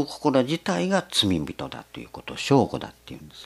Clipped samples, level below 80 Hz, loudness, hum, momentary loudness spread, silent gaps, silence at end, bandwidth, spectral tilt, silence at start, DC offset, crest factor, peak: under 0.1%; -54 dBFS; -24 LUFS; none; 17 LU; none; 0 s; 14.5 kHz; -5 dB/octave; 0 s; under 0.1%; 20 dB; -4 dBFS